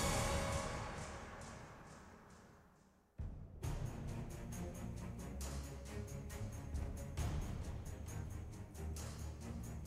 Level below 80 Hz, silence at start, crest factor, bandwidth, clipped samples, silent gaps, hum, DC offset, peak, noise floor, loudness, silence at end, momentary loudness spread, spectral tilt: -50 dBFS; 0 s; 20 dB; 16 kHz; under 0.1%; none; none; under 0.1%; -26 dBFS; -69 dBFS; -46 LUFS; 0 s; 15 LU; -5 dB/octave